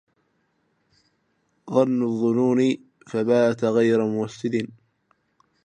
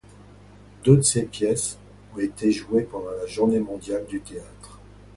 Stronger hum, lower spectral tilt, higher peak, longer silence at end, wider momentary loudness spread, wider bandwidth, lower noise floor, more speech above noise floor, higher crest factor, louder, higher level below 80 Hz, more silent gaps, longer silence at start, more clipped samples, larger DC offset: second, none vs 50 Hz at -45 dBFS; first, -7 dB/octave vs -5.5 dB/octave; second, -6 dBFS vs -2 dBFS; first, 1 s vs 0.4 s; second, 9 LU vs 22 LU; second, 9.8 kHz vs 11.5 kHz; first, -69 dBFS vs -48 dBFS; first, 48 dB vs 25 dB; about the same, 18 dB vs 22 dB; about the same, -22 LUFS vs -23 LUFS; second, -70 dBFS vs -50 dBFS; neither; first, 1.65 s vs 0.8 s; neither; neither